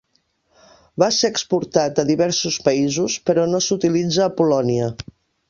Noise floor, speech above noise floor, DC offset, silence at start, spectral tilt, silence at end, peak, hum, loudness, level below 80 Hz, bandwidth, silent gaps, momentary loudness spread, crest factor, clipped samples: -66 dBFS; 47 dB; under 0.1%; 0.95 s; -4.5 dB/octave; 0.45 s; 0 dBFS; none; -19 LUFS; -54 dBFS; 7.4 kHz; none; 5 LU; 18 dB; under 0.1%